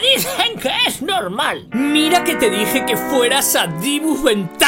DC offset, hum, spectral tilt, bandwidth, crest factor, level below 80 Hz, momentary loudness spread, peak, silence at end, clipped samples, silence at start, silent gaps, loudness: under 0.1%; none; -2.5 dB/octave; 16.5 kHz; 16 dB; -48 dBFS; 6 LU; -2 dBFS; 0 s; under 0.1%; 0 s; none; -16 LUFS